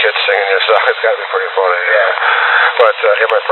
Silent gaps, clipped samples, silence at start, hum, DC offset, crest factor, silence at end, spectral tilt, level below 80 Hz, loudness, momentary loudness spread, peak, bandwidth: none; under 0.1%; 0 s; none; under 0.1%; 12 dB; 0 s; 0 dB/octave; -80 dBFS; -11 LUFS; 4 LU; 0 dBFS; 4.3 kHz